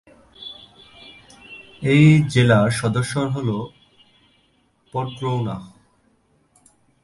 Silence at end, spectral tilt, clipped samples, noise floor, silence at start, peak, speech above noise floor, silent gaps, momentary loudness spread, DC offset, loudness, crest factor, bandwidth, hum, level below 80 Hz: 1.35 s; -6.5 dB/octave; under 0.1%; -62 dBFS; 0.4 s; -2 dBFS; 44 dB; none; 24 LU; under 0.1%; -19 LUFS; 20 dB; 11.5 kHz; none; -52 dBFS